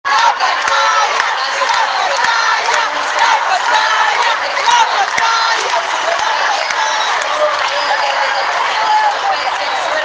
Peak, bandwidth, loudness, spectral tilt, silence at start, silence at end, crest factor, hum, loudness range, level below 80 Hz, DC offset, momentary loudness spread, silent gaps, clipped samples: 0 dBFS; 10.5 kHz; -13 LUFS; 1 dB/octave; 0.05 s; 0 s; 14 dB; none; 2 LU; -60 dBFS; under 0.1%; 4 LU; none; under 0.1%